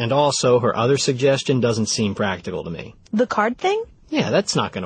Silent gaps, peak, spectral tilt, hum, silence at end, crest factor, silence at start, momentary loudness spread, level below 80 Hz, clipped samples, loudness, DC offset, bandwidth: none; -6 dBFS; -4.5 dB/octave; none; 0 s; 14 dB; 0 s; 10 LU; -54 dBFS; under 0.1%; -20 LUFS; under 0.1%; 9.8 kHz